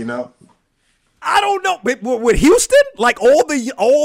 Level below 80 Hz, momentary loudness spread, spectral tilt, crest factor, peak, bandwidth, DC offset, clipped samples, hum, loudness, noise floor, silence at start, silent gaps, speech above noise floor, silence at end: -34 dBFS; 14 LU; -3.5 dB/octave; 10 dB; -4 dBFS; 16 kHz; under 0.1%; under 0.1%; none; -14 LUFS; -63 dBFS; 0 s; none; 49 dB; 0 s